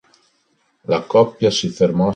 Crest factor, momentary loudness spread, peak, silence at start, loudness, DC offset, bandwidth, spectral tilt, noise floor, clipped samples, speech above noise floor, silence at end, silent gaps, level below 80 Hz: 16 dB; 7 LU; -2 dBFS; 0.9 s; -17 LUFS; under 0.1%; 9.4 kHz; -5.5 dB/octave; -64 dBFS; under 0.1%; 47 dB; 0 s; none; -52 dBFS